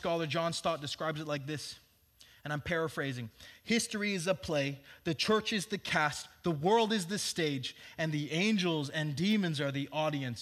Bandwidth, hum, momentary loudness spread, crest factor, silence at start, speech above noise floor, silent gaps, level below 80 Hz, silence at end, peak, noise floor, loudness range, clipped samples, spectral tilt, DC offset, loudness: 15 kHz; none; 10 LU; 20 dB; 0 s; 29 dB; none; -66 dBFS; 0 s; -14 dBFS; -62 dBFS; 5 LU; under 0.1%; -4.5 dB/octave; under 0.1%; -33 LUFS